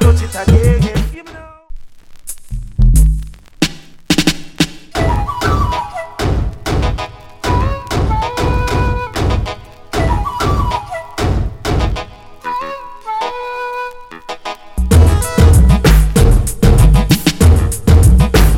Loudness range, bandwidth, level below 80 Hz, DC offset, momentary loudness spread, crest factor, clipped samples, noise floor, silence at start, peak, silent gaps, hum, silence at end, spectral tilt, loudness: 9 LU; 16.5 kHz; -16 dBFS; under 0.1%; 16 LU; 12 dB; 0.2%; -35 dBFS; 0 s; 0 dBFS; none; none; 0 s; -5.5 dB/octave; -14 LUFS